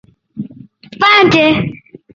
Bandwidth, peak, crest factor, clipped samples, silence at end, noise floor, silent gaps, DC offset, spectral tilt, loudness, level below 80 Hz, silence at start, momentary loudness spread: 7.6 kHz; 0 dBFS; 14 dB; under 0.1%; 0.4 s; -37 dBFS; none; under 0.1%; -5.5 dB/octave; -10 LUFS; -46 dBFS; 0.35 s; 21 LU